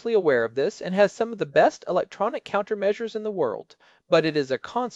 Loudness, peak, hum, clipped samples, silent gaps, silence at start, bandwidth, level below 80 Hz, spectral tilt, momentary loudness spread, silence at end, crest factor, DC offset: -24 LUFS; -6 dBFS; none; under 0.1%; none; 0.05 s; 8 kHz; -68 dBFS; -5.5 dB/octave; 7 LU; 0 s; 18 dB; under 0.1%